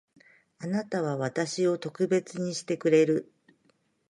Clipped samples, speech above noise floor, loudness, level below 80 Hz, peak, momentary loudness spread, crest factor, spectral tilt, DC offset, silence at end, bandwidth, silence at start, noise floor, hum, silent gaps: under 0.1%; 42 dB; -28 LUFS; -76 dBFS; -10 dBFS; 10 LU; 20 dB; -5.5 dB/octave; under 0.1%; 0.85 s; 11.5 kHz; 0.6 s; -69 dBFS; none; none